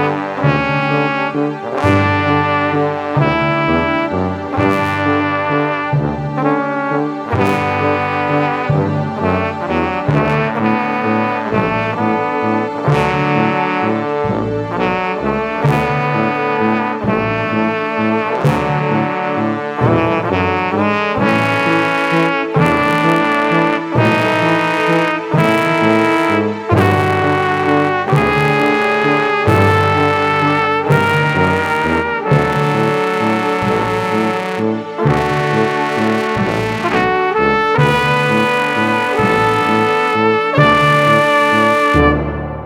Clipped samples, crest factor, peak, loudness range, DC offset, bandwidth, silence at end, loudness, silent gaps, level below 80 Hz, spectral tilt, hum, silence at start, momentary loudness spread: under 0.1%; 14 dB; 0 dBFS; 3 LU; under 0.1%; 15 kHz; 0 s; -14 LUFS; none; -38 dBFS; -6.5 dB/octave; none; 0 s; 5 LU